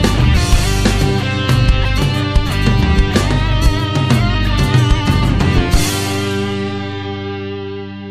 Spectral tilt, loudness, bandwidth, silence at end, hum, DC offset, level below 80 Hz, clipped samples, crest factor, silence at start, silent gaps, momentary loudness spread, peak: -5.5 dB/octave; -15 LUFS; 15 kHz; 0 s; 50 Hz at -40 dBFS; under 0.1%; -18 dBFS; under 0.1%; 14 dB; 0 s; none; 10 LU; 0 dBFS